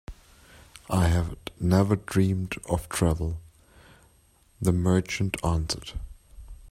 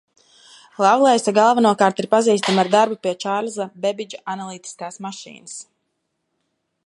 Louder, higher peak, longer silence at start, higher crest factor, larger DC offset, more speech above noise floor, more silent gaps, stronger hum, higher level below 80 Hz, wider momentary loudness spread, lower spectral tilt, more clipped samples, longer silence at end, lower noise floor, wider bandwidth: second, -26 LUFS vs -18 LUFS; second, -8 dBFS vs 0 dBFS; second, 0.1 s vs 0.8 s; about the same, 20 dB vs 20 dB; neither; second, 36 dB vs 55 dB; neither; neither; first, -42 dBFS vs -74 dBFS; about the same, 17 LU vs 18 LU; first, -6 dB/octave vs -4 dB/octave; neither; second, 0 s vs 1.25 s; second, -61 dBFS vs -74 dBFS; first, 15.5 kHz vs 11.5 kHz